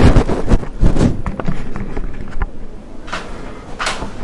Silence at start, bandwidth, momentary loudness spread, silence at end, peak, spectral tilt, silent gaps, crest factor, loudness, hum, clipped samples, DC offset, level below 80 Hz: 0 s; 11 kHz; 16 LU; 0 s; 0 dBFS; -6.5 dB/octave; none; 14 dB; -20 LUFS; none; under 0.1%; under 0.1%; -18 dBFS